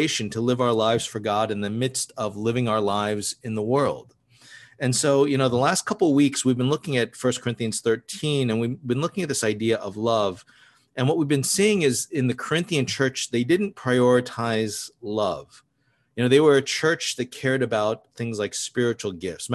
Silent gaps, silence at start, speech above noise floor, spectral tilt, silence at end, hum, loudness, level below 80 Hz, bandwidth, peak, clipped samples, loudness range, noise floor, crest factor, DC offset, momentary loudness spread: none; 0 s; 45 dB; -4.5 dB/octave; 0 s; none; -23 LUFS; -60 dBFS; 13 kHz; -4 dBFS; under 0.1%; 3 LU; -68 dBFS; 18 dB; under 0.1%; 9 LU